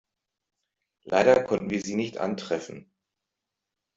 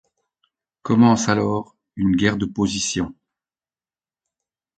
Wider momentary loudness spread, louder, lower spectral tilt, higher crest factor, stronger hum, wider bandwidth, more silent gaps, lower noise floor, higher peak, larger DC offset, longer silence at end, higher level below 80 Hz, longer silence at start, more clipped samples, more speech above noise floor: about the same, 12 LU vs 14 LU; second, -26 LUFS vs -20 LUFS; about the same, -5 dB/octave vs -5 dB/octave; about the same, 24 dB vs 20 dB; neither; second, 7.8 kHz vs 9.2 kHz; neither; second, -86 dBFS vs under -90 dBFS; second, -6 dBFS vs -2 dBFS; neither; second, 1.15 s vs 1.65 s; second, -64 dBFS vs -48 dBFS; first, 1.05 s vs 0.85 s; neither; second, 61 dB vs over 71 dB